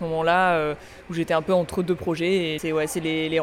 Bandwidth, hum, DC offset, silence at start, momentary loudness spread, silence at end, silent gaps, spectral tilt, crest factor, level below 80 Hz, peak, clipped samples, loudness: 16 kHz; none; under 0.1%; 0 s; 9 LU; 0 s; none; -5 dB/octave; 14 dB; -52 dBFS; -8 dBFS; under 0.1%; -23 LUFS